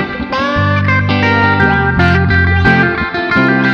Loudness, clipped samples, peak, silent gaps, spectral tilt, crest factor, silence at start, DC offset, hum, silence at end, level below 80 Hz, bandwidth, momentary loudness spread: -11 LUFS; under 0.1%; 0 dBFS; none; -7.5 dB/octave; 12 dB; 0 s; under 0.1%; none; 0 s; -28 dBFS; 6.8 kHz; 5 LU